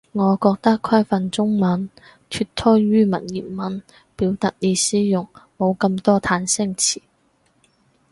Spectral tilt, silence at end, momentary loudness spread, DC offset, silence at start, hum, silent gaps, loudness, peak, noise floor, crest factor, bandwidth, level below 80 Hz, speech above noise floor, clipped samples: -4.5 dB/octave; 1.15 s; 11 LU; under 0.1%; 0.15 s; none; none; -19 LUFS; -2 dBFS; -62 dBFS; 18 dB; 11.5 kHz; -52 dBFS; 43 dB; under 0.1%